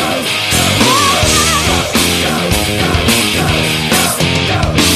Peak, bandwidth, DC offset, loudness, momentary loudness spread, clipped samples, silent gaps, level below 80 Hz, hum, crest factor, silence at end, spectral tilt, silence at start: 0 dBFS; 14.5 kHz; under 0.1%; -11 LUFS; 4 LU; under 0.1%; none; -26 dBFS; none; 12 dB; 0 s; -3 dB/octave; 0 s